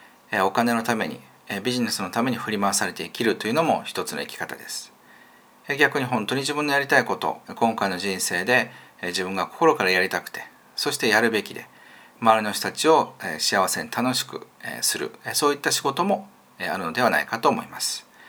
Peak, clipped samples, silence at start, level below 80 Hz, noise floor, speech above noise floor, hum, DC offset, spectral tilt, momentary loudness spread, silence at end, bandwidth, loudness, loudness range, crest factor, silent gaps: -2 dBFS; under 0.1%; 0.3 s; -72 dBFS; -52 dBFS; 29 dB; none; under 0.1%; -3 dB/octave; 12 LU; 0 s; over 20 kHz; -23 LUFS; 3 LU; 22 dB; none